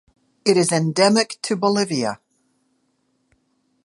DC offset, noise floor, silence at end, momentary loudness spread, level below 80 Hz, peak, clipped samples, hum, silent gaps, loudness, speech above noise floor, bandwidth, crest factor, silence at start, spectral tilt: under 0.1%; -68 dBFS; 1.7 s; 8 LU; -68 dBFS; -2 dBFS; under 0.1%; none; none; -19 LUFS; 49 dB; 11.5 kHz; 20 dB; 0.45 s; -4.5 dB/octave